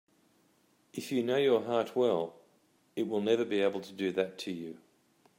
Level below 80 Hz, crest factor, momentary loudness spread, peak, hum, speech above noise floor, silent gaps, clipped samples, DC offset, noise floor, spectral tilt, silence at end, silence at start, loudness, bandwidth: -82 dBFS; 18 dB; 14 LU; -16 dBFS; none; 38 dB; none; under 0.1%; under 0.1%; -69 dBFS; -5.5 dB/octave; 0.65 s; 0.95 s; -32 LUFS; 16 kHz